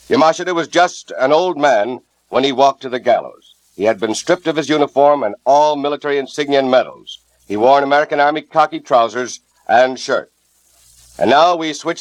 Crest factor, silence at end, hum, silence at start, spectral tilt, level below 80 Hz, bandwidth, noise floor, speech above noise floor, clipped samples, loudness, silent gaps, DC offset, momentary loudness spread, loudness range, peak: 16 dB; 0 s; none; 0.1 s; -4 dB/octave; -62 dBFS; 11.5 kHz; -55 dBFS; 40 dB; under 0.1%; -15 LUFS; none; under 0.1%; 9 LU; 2 LU; 0 dBFS